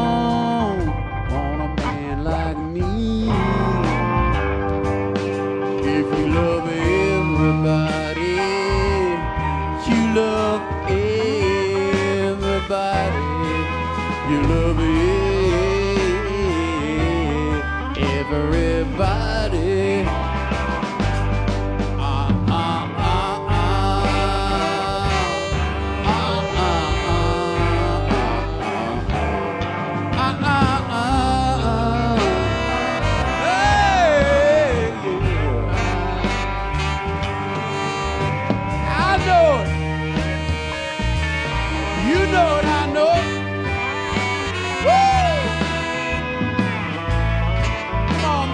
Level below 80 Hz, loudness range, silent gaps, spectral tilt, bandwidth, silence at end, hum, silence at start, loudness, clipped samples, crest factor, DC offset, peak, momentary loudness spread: -28 dBFS; 3 LU; none; -6 dB/octave; 10.5 kHz; 0 s; none; 0 s; -20 LUFS; under 0.1%; 16 dB; under 0.1%; -4 dBFS; 6 LU